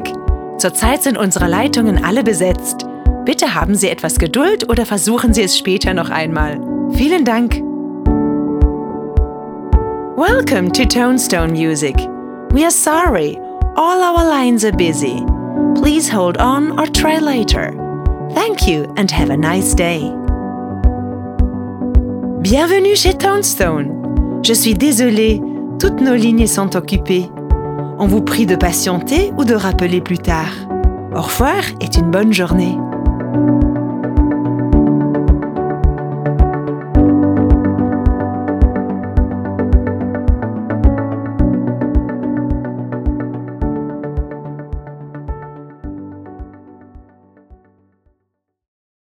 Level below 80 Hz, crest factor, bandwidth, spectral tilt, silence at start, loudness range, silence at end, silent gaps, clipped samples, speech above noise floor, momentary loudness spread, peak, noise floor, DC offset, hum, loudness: -20 dBFS; 14 dB; 19.5 kHz; -5 dB/octave; 0 s; 5 LU; 2.1 s; none; under 0.1%; 59 dB; 9 LU; 0 dBFS; -72 dBFS; under 0.1%; none; -15 LUFS